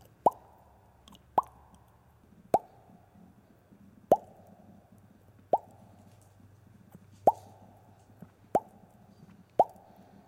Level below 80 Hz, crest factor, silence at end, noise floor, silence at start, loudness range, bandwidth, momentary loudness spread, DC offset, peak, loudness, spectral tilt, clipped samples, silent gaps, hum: -68 dBFS; 26 dB; 0.6 s; -61 dBFS; 0.25 s; 4 LU; 16.5 kHz; 27 LU; under 0.1%; -8 dBFS; -31 LUFS; -7 dB/octave; under 0.1%; none; none